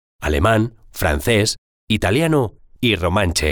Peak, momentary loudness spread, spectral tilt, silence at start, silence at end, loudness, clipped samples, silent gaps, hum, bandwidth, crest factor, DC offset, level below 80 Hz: -4 dBFS; 6 LU; -5 dB/octave; 0.2 s; 0 s; -18 LUFS; under 0.1%; 1.58-1.87 s; none; over 20 kHz; 14 dB; under 0.1%; -30 dBFS